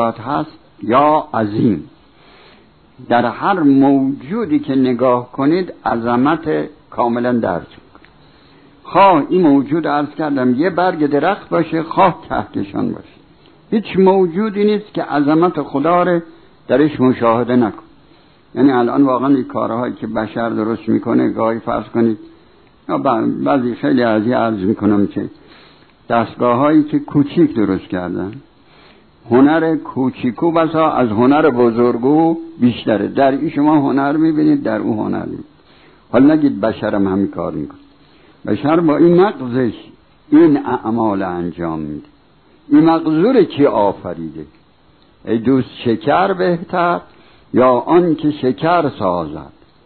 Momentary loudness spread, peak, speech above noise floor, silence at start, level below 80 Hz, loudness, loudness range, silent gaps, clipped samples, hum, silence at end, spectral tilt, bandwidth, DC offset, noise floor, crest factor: 10 LU; -2 dBFS; 37 dB; 0 s; -52 dBFS; -15 LUFS; 3 LU; none; under 0.1%; none; 0.45 s; -11 dB/octave; 4.5 kHz; 0.2%; -51 dBFS; 14 dB